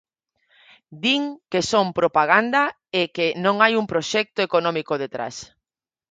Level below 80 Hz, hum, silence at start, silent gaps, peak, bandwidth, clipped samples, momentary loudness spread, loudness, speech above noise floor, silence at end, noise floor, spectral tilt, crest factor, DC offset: -62 dBFS; none; 0.9 s; none; -2 dBFS; 9.4 kHz; under 0.1%; 9 LU; -21 LUFS; 68 dB; 0.65 s; -89 dBFS; -4 dB/octave; 22 dB; under 0.1%